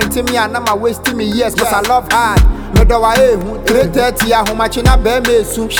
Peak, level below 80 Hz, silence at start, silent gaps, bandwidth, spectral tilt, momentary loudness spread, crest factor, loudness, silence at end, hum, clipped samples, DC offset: 0 dBFS; -18 dBFS; 0 s; none; over 20 kHz; -4.5 dB/octave; 4 LU; 12 dB; -12 LUFS; 0 s; none; under 0.1%; under 0.1%